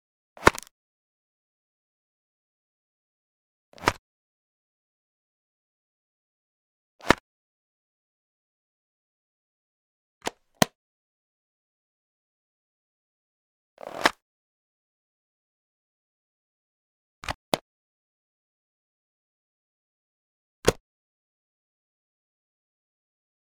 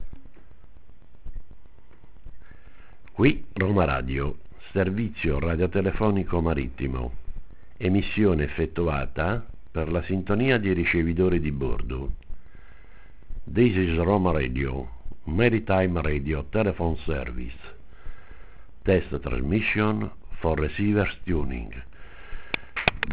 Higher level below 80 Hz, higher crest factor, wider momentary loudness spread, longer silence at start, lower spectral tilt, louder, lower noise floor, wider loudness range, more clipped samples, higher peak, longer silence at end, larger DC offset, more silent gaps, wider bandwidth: second, -54 dBFS vs -36 dBFS; first, 36 dB vs 26 dB; first, 19 LU vs 15 LU; first, 0.4 s vs 0 s; second, -3.5 dB/octave vs -11 dB/octave; about the same, -27 LUFS vs -26 LUFS; first, under -90 dBFS vs -50 dBFS; about the same, 5 LU vs 3 LU; neither; about the same, 0 dBFS vs 0 dBFS; first, 2.7 s vs 0 s; second, under 0.1% vs 1%; first, 0.71-3.72 s, 3.98-6.99 s, 7.20-10.21 s, 10.75-13.77 s, 14.22-17.22 s, 17.35-17.52 s, 17.61-20.63 s vs none; first, 17.5 kHz vs 4 kHz